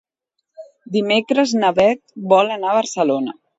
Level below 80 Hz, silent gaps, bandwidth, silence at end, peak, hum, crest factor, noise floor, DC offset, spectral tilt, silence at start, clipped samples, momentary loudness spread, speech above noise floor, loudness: -60 dBFS; none; 8 kHz; 0.25 s; 0 dBFS; none; 18 dB; -76 dBFS; under 0.1%; -4.5 dB/octave; 0.6 s; under 0.1%; 7 LU; 60 dB; -17 LUFS